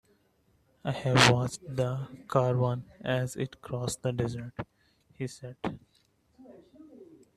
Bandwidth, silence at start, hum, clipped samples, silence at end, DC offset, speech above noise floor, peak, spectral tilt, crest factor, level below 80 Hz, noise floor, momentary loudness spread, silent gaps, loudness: 14 kHz; 0.85 s; none; under 0.1%; 0.3 s; under 0.1%; 40 dB; -6 dBFS; -5 dB/octave; 26 dB; -60 dBFS; -69 dBFS; 18 LU; none; -30 LUFS